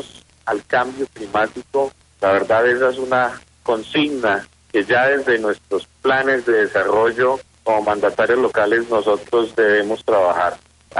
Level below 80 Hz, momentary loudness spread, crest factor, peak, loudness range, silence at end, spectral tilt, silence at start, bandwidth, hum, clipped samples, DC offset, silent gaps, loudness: -56 dBFS; 8 LU; 12 dB; -6 dBFS; 2 LU; 0 s; -5 dB/octave; 0 s; 11.5 kHz; none; under 0.1%; under 0.1%; none; -18 LUFS